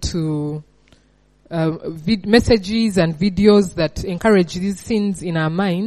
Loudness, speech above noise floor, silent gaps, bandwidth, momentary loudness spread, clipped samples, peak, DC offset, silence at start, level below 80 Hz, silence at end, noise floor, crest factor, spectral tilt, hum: -18 LUFS; 39 dB; none; 13 kHz; 11 LU; under 0.1%; 0 dBFS; under 0.1%; 0 s; -38 dBFS; 0 s; -56 dBFS; 18 dB; -6 dB/octave; none